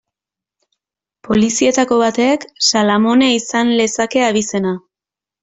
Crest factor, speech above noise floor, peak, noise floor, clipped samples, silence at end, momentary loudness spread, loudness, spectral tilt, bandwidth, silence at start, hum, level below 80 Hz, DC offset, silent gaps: 14 dB; 74 dB; -2 dBFS; -88 dBFS; under 0.1%; 0.65 s; 6 LU; -14 LUFS; -3.5 dB/octave; 8.4 kHz; 1.25 s; none; -54 dBFS; under 0.1%; none